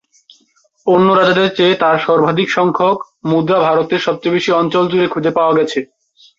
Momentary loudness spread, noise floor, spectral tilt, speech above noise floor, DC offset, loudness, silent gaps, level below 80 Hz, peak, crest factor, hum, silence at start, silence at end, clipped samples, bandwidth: 6 LU; -56 dBFS; -6 dB/octave; 43 dB; under 0.1%; -13 LUFS; none; -58 dBFS; 0 dBFS; 14 dB; none; 0.85 s; 0.55 s; under 0.1%; 7.6 kHz